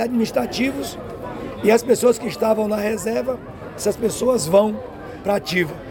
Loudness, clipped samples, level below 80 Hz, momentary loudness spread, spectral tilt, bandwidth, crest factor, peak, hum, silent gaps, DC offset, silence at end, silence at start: -20 LUFS; under 0.1%; -48 dBFS; 14 LU; -4.5 dB/octave; 17 kHz; 18 dB; -4 dBFS; none; none; under 0.1%; 0 s; 0 s